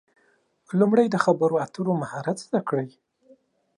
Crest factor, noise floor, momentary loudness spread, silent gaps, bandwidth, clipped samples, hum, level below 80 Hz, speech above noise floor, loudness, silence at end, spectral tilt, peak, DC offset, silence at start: 20 dB; -65 dBFS; 10 LU; none; 11.5 kHz; under 0.1%; none; -74 dBFS; 42 dB; -24 LUFS; 0.9 s; -7 dB/octave; -4 dBFS; under 0.1%; 0.7 s